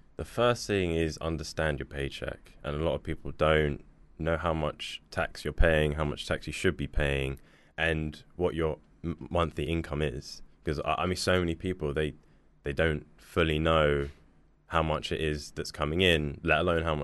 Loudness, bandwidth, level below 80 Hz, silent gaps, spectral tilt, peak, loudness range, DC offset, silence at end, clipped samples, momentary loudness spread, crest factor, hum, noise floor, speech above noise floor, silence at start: -30 LUFS; 12 kHz; -40 dBFS; none; -5.5 dB/octave; -10 dBFS; 3 LU; under 0.1%; 0 s; under 0.1%; 13 LU; 20 dB; none; -60 dBFS; 31 dB; 0.2 s